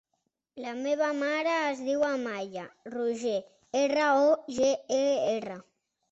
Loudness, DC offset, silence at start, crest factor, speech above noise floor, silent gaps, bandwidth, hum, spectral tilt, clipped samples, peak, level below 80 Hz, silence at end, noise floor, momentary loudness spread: -28 LUFS; under 0.1%; 0.55 s; 16 dB; 52 dB; none; 8.2 kHz; none; -3.5 dB/octave; under 0.1%; -14 dBFS; -74 dBFS; 0.5 s; -80 dBFS; 15 LU